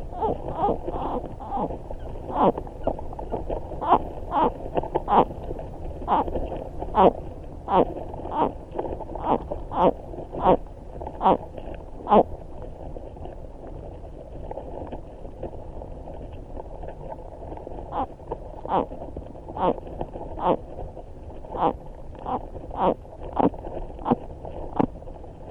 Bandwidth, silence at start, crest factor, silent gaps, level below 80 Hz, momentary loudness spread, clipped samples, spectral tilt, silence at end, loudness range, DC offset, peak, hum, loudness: 7.4 kHz; 0 s; 24 dB; none; -38 dBFS; 18 LU; under 0.1%; -9 dB/octave; 0 s; 14 LU; under 0.1%; -2 dBFS; none; -26 LUFS